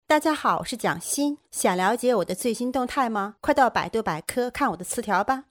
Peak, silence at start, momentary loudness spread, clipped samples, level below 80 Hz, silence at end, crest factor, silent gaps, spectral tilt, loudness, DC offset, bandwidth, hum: -6 dBFS; 0.1 s; 6 LU; under 0.1%; -56 dBFS; 0.1 s; 18 dB; none; -3.5 dB/octave; -24 LUFS; under 0.1%; over 20 kHz; none